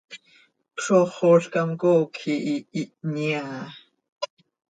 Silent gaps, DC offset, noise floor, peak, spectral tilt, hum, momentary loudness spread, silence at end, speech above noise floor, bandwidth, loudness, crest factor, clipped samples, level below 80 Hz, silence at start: 4.12-4.16 s; under 0.1%; -59 dBFS; -6 dBFS; -6 dB/octave; none; 18 LU; 0.45 s; 37 dB; 9.2 kHz; -23 LUFS; 18 dB; under 0.1%; -72 dBFS; 0.1 s